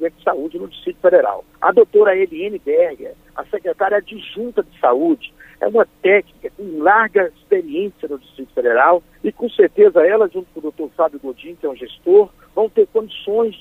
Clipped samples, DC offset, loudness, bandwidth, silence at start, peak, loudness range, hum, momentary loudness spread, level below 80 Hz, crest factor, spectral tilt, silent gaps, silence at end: under 0.1%; under 0.1%; -17 LUFS; 3.9 kHz; 0 s; -2 dBFS; 3 LU; none; 16 LU; -56 dBFS; 16 dB; -6.5 dB/octave; none; 0.05 s